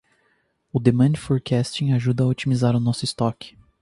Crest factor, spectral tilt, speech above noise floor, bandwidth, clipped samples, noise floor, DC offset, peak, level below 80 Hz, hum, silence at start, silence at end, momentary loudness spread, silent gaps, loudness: 20 dB; -7 dB/octave; 46 dB; 11.5 kHz; under 0.1%; -67 dBFS; under 0.1%; -2 dBFS; -52 dBFS; none; 0.75 s; 0.3 s; 7 LU; none; -21 LUFS